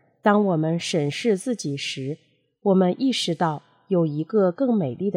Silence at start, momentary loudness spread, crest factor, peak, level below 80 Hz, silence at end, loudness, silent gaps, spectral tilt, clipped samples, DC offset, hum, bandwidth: 0.25 s; 8 LU; 16 dB; -6 dBFS; -76 dBFS; 0 s; -23 LUFS; none; -6 dB/octave; under 0.1%; under 0.1%; none; 14 kHz